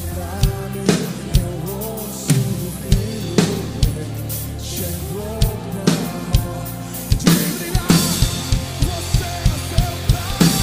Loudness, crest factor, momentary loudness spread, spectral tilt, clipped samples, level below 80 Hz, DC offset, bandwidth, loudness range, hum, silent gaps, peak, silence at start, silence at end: -20 LUFS; 18 dB; 10 LU; -5 dB/octave; under 0.1%; -26 dBFS; under 0.1%; 16 kHz; 4 LU; none; none; 0 dBFS; 0 s; 0 s